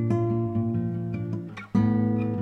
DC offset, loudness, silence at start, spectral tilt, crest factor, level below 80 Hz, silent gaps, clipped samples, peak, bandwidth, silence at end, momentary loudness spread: under 0.1%; -27 LUFS; 0 s; -10.5 dB/octave; 14 dB; -54 dBFS; none; under 0.1%; -12 dBFS; 6.2 kHz; 0 s; 8 LU